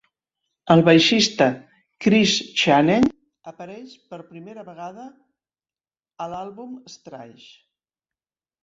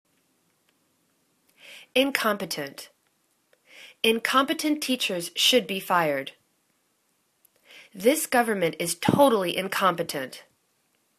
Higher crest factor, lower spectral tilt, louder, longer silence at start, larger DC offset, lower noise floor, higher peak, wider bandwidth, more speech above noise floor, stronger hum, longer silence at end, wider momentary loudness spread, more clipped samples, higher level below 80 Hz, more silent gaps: about the same, 20 dB vs 22 dB; first, -4.5 dB/octave vs -3 dB/octave; first, -17 LUFS vs -24 LUFS; second, 0.65 s vs 1.65 s; neither; first, under -90 dBFS vs -71 dBFS; first, -2 dBFS vs -6 dBFS; second, 8 kHz vs 14 kHz; first, over 70 dB vs 46 dB; neither; first, 1.4 s vs 0.8 s; first, 26 LU vs 17 LU; neither; first, -58 dBFS vs -68 dBFS; neither